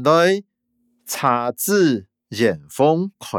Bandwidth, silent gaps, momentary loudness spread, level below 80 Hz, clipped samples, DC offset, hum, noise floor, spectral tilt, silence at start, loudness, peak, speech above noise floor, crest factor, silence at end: over 20 kHz; none; 10 LU; -68 dBFS; under 0.1%; under 0.1%; none; -67 dBFS; -5 dB/octave; 0 s; -19 LUFS; -2 dBFS; 49 dB; 16 dB; 0 s